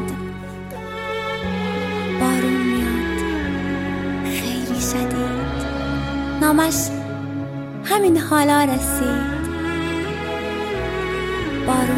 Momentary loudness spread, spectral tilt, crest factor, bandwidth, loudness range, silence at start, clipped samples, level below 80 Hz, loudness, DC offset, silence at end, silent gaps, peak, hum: 11 LU; -4.5 dB/octave; 18 dB; 16.5 kHz; 4 LU; 0 s; under 0.1%; -36 dBFS; -21 LUFS; under 0.1%; 0 s; none; -4 dBFS; none